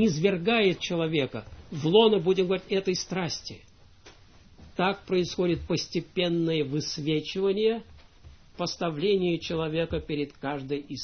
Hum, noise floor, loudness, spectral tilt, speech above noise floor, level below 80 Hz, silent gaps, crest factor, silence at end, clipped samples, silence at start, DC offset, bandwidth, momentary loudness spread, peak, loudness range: none; -54 dBFS; -27 LUFS; -5.5 dB/octave; 27 dB; -52 dBFS; none; 20 dB; 0 s; under 0.1%; 0 s; under 0.1%; 6.6 kHz; 10 LU; -8 dBFS; 5 LU